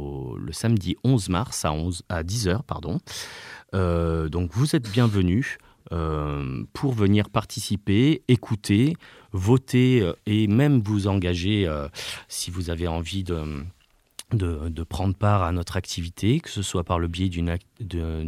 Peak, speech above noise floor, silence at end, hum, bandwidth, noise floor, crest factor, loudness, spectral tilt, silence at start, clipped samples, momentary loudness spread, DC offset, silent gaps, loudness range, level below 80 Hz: -6 dBFS; 23 dB; 0 s; none; 15.5 kHz; -47 dBFS; 18 dB; -25 LUFS; -6 dB/octave; 0 s; under 0.1%; 12 LU; under 0.1%; none; 5 LU; -40 dBFS